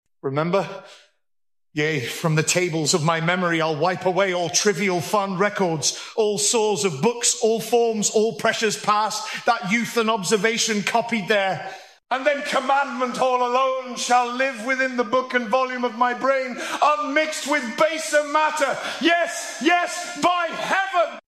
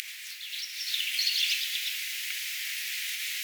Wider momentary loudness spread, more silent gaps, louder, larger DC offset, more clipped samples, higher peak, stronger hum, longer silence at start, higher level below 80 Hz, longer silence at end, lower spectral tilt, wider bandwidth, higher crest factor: second, 5 LU vs 10 LU; neither; first, -21 LUFS vs -29 LUFS; neither; neither; first, -4 dBFS vs -14 dBFS; neither; first, 0.25 s vs 0 s; first, -72 dBFS vs under -90 dBFS; about the same, 0.05 s vs 0 s; first, -3 dB/octave vs 13 dB/octave; second, 14.5 kHz vs over 20 kHz; about the same, 18 dB vs 20 dB